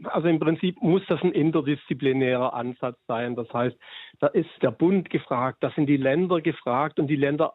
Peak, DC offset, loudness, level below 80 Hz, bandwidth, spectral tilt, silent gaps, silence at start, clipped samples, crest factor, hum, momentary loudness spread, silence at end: -8 dBFS; under 0.1%; -25 LUFS; -68 dBFS; 4.1 kHz; -10.5 dB/octave; none; 0 s; under 0.1%; 16 dB; none; 7 LU; 0.05 s